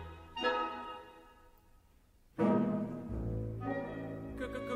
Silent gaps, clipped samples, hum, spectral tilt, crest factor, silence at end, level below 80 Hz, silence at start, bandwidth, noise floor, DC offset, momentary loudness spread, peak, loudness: none; under 0.1%; none; -7.5 dB/octave; 20 dB; 0 s; -52 dBFS; 0 s; 15 kHz; -65 dBFS; under 0.1%; 15 LU; -18 dBFS; -37 LUFS